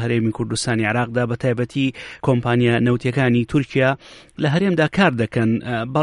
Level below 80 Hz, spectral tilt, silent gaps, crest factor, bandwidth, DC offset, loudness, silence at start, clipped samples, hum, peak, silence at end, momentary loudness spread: -48 dBFS; -6.5 dB/octave; none; 18 dB; 11 kHz; under 0.1%; -19 LUFS; 0 s; under 0.1%; none; -2 dBFS; 0 s; 6 LU